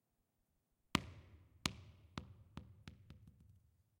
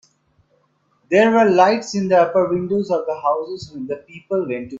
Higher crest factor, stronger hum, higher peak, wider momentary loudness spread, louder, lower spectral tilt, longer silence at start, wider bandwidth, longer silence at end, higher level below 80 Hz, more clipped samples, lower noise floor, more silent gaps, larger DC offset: first, 38 dB vs 18 dB; neither; second, -14 dBFS vs 0 dBFS; first, 22 LU vs 16 LU; second, -46 LUFS vs -18 LUFS; second, -3.5 dB/octave vs -6 dB/octave; second, 0.95 s vs 1.1 s; first, 16 kHz vs 7.8 kHz; first, 0.4 s vs 0 s; about the same, -64 dBFS vs -60 dBFS; neither; first, -84 dBFS vs -63 dBFS; neither; neither